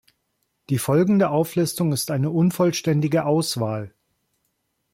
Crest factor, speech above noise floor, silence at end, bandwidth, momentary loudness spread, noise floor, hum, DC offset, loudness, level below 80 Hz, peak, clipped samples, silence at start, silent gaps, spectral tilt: 14 dB; 53 dB; 1.05 s; 16.5 kHz; 8 LU; -73 dBFS; none; under 0.1%; -21 LUFS; -60 dBFS; -8 dBFS; under 0.1%; 0.7 s; none; -6 dB/octave